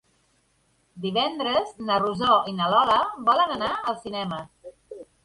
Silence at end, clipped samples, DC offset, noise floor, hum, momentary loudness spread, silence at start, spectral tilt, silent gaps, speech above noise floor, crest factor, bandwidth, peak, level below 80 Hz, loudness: 0.2 s; under 0.1%; under 0.1%; -67 dBFS; none; 15 LU; 0.95 s; -5.5 dB/octave; none; 43 dB; 18 dB; 11.5 kHz; -6 dBFS; -60 dBFS; -23 LUFS